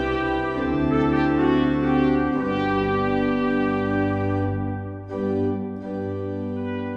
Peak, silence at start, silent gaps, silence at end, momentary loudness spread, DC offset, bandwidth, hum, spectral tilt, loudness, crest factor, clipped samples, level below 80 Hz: -8 dBFS; 0 s; none; 0 s; 9 LU; under 0.1%; 6.6 kHz; none; -8.5 dB/octave; -23 LUFS; 14 dB; under 0.1%; -42 dBFS